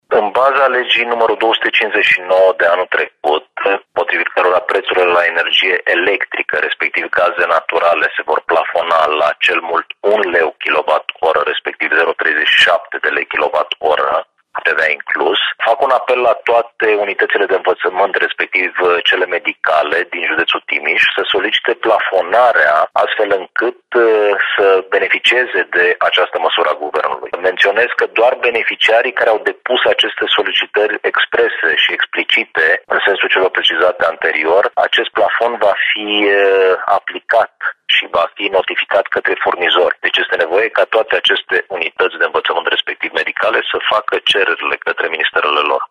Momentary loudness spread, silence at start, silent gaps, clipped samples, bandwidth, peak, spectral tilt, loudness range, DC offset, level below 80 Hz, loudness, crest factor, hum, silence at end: 5 LU; 0.1 s; none; under 0.1%; 11 kHz; 0 dBFS; -2.5 dB/octave; 2 LU; under 0.1%; -60 dBFS; -13 LUFS; 14 dB; none; 0.05 s